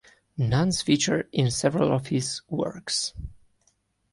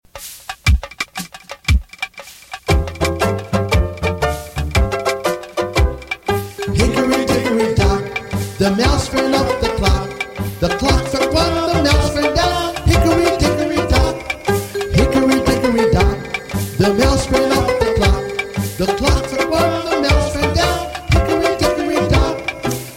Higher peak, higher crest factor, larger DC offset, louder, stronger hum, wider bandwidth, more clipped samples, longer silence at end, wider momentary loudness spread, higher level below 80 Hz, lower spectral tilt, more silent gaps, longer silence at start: second, -8 dBFS vs -2 dBFS; about the same, 18 dB vs 14 dB; neither; second, -25 LUFS vs -17 LUFS; neither; second, 11.5 kHz vs 16.5 kHz; neither; first, 0.75 s vs 0 s; about the same, 9 LU vs 9 LU; second, -48 dBFS vs -24 dBFS; about the same, -4.5 dB/octave vs -5.5 dB/octave; neither; first, 0.35 s vs 0.15 s